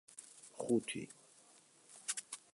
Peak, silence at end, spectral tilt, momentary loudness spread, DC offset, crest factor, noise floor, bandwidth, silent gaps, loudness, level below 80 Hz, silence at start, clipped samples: -22 dBFS; 0.15 s; -3.5 dB/octave; 23 LU; under 0.1%; 22 dB; -66 dBFS; 11.5 kHz; none; -41 LUFS; -82 dBFS; 0.1 s; under 0.1%